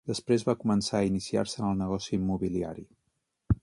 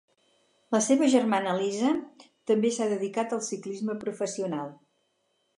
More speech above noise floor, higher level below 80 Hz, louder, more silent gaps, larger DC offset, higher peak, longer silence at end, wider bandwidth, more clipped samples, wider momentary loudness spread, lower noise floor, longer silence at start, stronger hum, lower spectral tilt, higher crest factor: about the same, 50 dB vs 47 dB; first, -46 dBFS vs -78 dBFS; about the same, -29 LUFS vs -27 LUFS; neither; neither; second, -12 dBFS vs -8 dBFS; second, 0.05 s vs 0.85 s; about the same, 11.5 kHz vs 11.5 kHz; neither; second, 5 LU vs 10 LU; first, -79 dBFS vs -74 dBFS; second, 0.05 s vs 0.7 s; neither; first, -6 dB/octave vs -4.5 dB/octave; about the same, 18 dB vs 20 dB